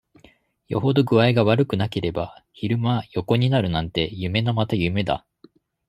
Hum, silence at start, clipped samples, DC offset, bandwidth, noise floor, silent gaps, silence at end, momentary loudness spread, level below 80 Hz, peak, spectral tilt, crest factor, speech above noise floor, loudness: none; 0.7 s; under 0.1%; under 0.1%; 11.5 kHz; -56 dBFS; none; 0.7 s; 10 LU; -50 dBFS; -4 dBFS; -8 dB/octave; 20 dB; 35 dB; -22 LUFS